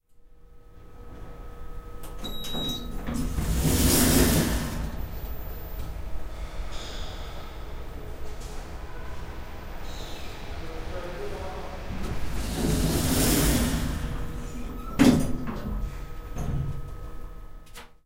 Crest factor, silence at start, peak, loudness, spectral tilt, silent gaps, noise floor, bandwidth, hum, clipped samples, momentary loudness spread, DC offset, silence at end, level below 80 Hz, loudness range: 22 dB; 0.15 s; -6 dBFS; -28 LUFS; -4.5 dB/octave; none; -50 dBFS; 16 kHz; none; under 0.1%; 22 LU; under 0.1%; 0.15 s; -34 dBFS; 14 LU